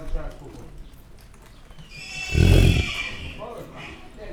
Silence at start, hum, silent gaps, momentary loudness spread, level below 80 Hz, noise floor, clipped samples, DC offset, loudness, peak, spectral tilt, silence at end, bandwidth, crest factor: 0 s; none; none; 25 LU; -28 dBFS; -46 dBFS; under 0.1%; under 0.1%; -22 LUFS; -4 dBFS; -5.5 dB/octave; 0 s; 16.5 kHz; 20 dB